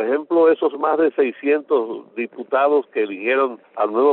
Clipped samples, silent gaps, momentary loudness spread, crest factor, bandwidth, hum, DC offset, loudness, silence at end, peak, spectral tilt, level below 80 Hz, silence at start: under 0.1%; none; 9 LU; 12 dB; 4.1 kHz; none; under 0.1%; -19 LUFS; 0 s; -6 dBFS; -2.5 dB/octave; -70 dBFS; 0 s